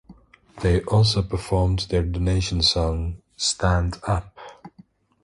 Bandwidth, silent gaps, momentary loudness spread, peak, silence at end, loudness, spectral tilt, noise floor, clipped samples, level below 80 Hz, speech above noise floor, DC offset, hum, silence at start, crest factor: 11.5 kHz; none; 10 LU; -8 dBFS; 0.55 s; -22 LUFS; -5 dB/octave; -53 dBFS; under 0.1%; -32 dBFS; 32 dB; under 0.1%; none; 0.1 s; 16 dB